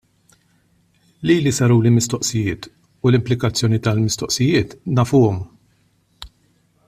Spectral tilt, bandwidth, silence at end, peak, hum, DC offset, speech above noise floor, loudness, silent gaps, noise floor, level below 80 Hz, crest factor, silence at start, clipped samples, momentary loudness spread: -5.5 dB/octave; 14.5 kHz; 0.6 s; -4 dBFS; none; under 0.1%; 43 dB; -18 LUFS; none; -60 dBFS; -48 dBFS; 16 dB; 1.2 s; under 0.1%; 11 LU